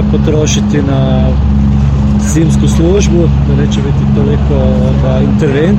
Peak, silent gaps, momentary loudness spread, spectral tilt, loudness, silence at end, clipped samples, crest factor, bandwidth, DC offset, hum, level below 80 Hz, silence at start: 0 dBFS; none; 2 LU; -7 dB/octave; -10 LUFS; 0 s; under 0.1%; 8 dB; 9 kHz; under 0.1%; none; -14 dBFS; 0 s